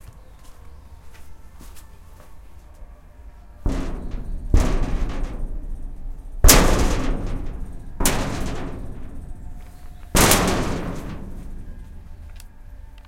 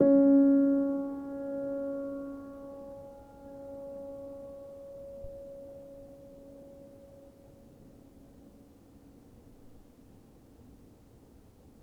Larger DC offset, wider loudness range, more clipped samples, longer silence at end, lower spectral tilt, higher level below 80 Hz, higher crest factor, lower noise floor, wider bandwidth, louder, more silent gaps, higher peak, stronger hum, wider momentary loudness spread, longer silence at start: neither; second, 10 LU vs 25 LU; neither; second, 0.05 s vs 5 s; second, -3.5 dB/octave vs -9.5 dB/octave; first, -26 dBFS vs -62 dBFS; about the same, 22 dB vs 22 dB; second, -42 dBFS vs -57 dBFS; first, 16.5 kHz vs 2.1 kHz; first, -21 LUFS vs -29 LUFS; neither; first, 0 dBFS vs -12 dBFS; neither; about the same, 27 LU vs 28 LU; about the same, 0.05 s vs 0 s